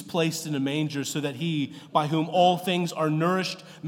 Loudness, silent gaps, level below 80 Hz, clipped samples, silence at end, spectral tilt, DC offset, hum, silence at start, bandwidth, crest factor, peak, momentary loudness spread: -26 LUFS; none; -78 dBFS; under 0.1%; 0 s; -5 dB/octave; under 0.1%; none; 0 s; 17 kHz; 18 dB; -8 dBFS; 7 LU